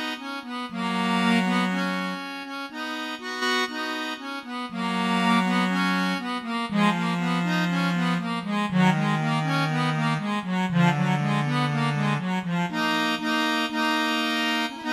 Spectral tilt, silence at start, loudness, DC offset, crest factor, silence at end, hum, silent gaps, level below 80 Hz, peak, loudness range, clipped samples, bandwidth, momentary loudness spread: -5.5 dB/octave; 0 s; -25 LUFS; under 0.1%; 18 dB; 0 s; none; none; -68 dBFS; -6 dBFS; 3 LU; under 0.1%; 14 kHz; 9 LU